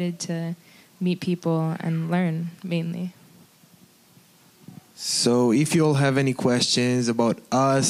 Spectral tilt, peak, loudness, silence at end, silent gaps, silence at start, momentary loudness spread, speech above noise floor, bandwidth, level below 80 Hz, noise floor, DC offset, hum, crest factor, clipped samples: -5 dB/octave; -6 dBFS; -23 LUFS; 0 s; none; 0 s; 11 LU; 33 dB; 15.5 kHz; -68 dBFS; -55 dBFS; under 0.1%; none; 16 dB; under 0.1%